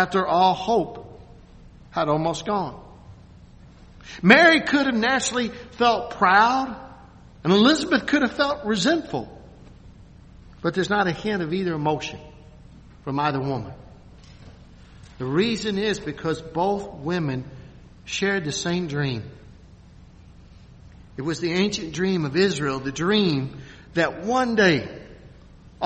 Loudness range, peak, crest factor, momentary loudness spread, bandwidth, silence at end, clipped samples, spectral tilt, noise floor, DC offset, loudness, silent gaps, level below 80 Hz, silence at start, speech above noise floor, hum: 9 LU; 0 dBFS; 24 dB; 16 LU; 8.4 kHz; 0 s; under 0.1%; -5 dB/octave; -47 dBFS; under 0.1%; -22 LUFS; none; -50 dBFS; 0 s; 25 dB; none